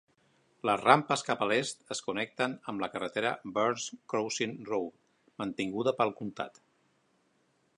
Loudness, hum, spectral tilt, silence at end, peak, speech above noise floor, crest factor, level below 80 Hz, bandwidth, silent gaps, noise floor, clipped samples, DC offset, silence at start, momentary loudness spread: -32 LUFS; none; -4 dB/octave; 1.3 s; -4 dBFS; 41 dB; 28 dB; -74 dBFS; 11 kHz; none; -72 dBFS; under 0.1%; under 0.1%; 0.65 s; 13 LU